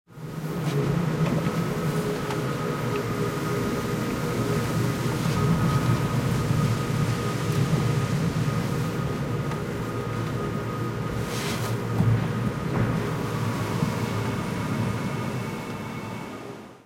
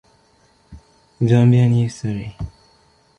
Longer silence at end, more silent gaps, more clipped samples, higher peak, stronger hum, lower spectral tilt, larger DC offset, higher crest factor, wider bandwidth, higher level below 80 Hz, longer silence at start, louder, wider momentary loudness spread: second, 0.1 s vs 0.7 s; neither; neither; second, -10 dBFS vs -2 dBFS; neither; second, -6.5 dB/octave vs -8.5 dB/octave; neither; about the same, 16 dB vs 16 dB; first, 16.5 kHz vs 9 kHz; about the same, -46 dBFS vs -46 dBFS; second, 0.1 s vs 0.7 s; second, -27 LUFS vs -17 LUFS; second, 6 LU vs 19 LU